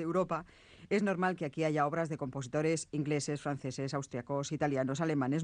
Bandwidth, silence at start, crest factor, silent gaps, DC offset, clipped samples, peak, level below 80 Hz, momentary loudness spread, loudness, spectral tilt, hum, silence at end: 10 kHz; 0 s; 16 dB; none; under 0.1%; under 0.1%; -18 dBFS; -68 dBFS; 6 LU; -34 LUFS; -6 dB/octave; none; 0 s